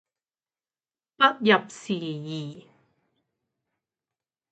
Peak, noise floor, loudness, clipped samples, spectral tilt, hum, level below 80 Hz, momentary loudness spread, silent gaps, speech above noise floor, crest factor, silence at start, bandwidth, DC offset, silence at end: -4 dBFS; under -90 dBFS; -24 LUFS; under 0.1%; -5 dB/octave; none; -78 dBFS; 15 LU; none; over 65 dB; 24 dB; 1.2 s; 9 kHz; under 0.1%; 1.9 s